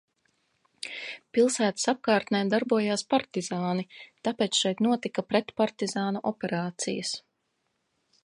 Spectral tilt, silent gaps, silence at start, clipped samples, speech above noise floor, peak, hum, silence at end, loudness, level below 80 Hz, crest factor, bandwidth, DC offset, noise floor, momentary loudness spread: -4 dB/octave; none; 0.85 s; under 0.1%; 50 dB; -10 dBFS; none; 1.05 s; -28 LUFS; -74 dBFS; 20 dB; 11.5 kHz; under 0.1%; -77 dBFS; 10 LU